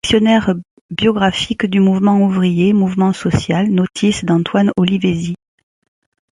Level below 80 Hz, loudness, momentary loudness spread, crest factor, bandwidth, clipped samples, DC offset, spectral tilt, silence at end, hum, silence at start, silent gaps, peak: -42 dBFS; -15 LUFS; 7 LU; 14 dB; 11.5 kHz; under 0.1%; under 0.1%; -6 dB/octave; 1.05 s; none; 0.05 s; 0.71-0.89 s; -2 dBFS